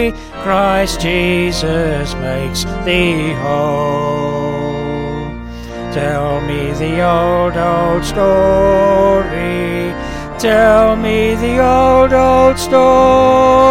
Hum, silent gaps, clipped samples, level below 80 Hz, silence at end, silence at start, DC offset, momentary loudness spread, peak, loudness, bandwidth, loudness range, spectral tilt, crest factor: none; none; under 0.1%; -28 dBFS; 0 s; 0 s; under 0.1%; 11 LU; 0 dBFS; -13 LUFS; 16.5 kHz; 7 LU; -5.5 dB/octave; 12 dB